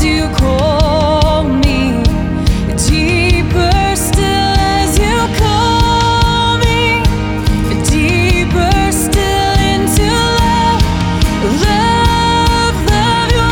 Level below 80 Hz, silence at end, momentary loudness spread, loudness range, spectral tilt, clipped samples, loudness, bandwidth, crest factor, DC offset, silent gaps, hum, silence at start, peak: -18 dBFS; 0 s; 3 LU; 1 LU; -5 dB/octave; under 0.1%; -12 LUFS; 18.5 kHz; 10 dB; under 0.1%; none; none; 0 s; 0 dBFS